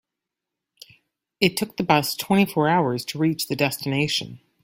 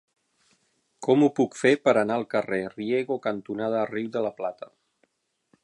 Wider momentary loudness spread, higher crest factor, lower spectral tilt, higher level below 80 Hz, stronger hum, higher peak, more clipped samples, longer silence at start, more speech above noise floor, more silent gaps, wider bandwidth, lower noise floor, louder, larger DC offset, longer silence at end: second, 5 LU vs 12 LU; about the same, 22 dB vs 20 dB; second, -4.5 dB/octave vs -6 dB/octave; first, -60 dBFS vs -72 dBFS; neither; first, -2 dBFS vs -6 dBFS; neither; first, 1.4 s vs 1 s; first, 63 dB vs 46 dB; neither; first, 16.5 kHz vs 11 kHz; first, -85 dBFS vs -71 dBFS; first, -22 LUFS vs -25 LUFS; neither; second, 0.25 s vs 1 s